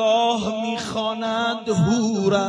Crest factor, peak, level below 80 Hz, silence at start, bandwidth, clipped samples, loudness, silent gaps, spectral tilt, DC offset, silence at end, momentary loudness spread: 14 dB; -6 dBFS; -54 dBFS; 0 s; 11 kHz; under 0.1%; -22 LUFS; none; -5.5 dB/octave; under 0.1%; 0 s; 6 LU